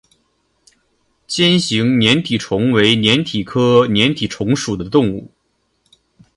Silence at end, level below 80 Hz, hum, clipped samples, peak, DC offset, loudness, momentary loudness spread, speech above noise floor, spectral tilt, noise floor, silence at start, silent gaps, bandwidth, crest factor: 1.1 s; -48 dBFS; none; under 0.1%; 0 dBFS; under 0.1%; -15 LUFS; 8 LU; 51 dB; -5 dB/octave; -66 dBFS; 1.3 s; none; 11.5 kHz; 16 dB